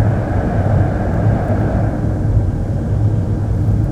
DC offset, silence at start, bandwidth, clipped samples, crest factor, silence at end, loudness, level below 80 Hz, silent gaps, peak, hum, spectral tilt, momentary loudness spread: under 0.1%; 0 s; 5.8 kHz; under 0.1%; 12 dB; 0 s; -17 LUFS; -22 dBFS; none; -2 dBFS; none; -10 dB/octave; 3 LU